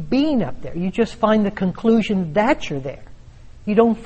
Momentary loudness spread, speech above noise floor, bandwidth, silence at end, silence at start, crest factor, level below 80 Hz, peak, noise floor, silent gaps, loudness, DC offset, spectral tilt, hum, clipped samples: 10 LU; 22 dB; 8.4 kHz; 0 s; 0 s; 18 dB; -42 dBFS; -2 dBFS; -40 dBFS; none; -20 LUFS; under 0.1%; -7 dB/octave; none; under 0.1%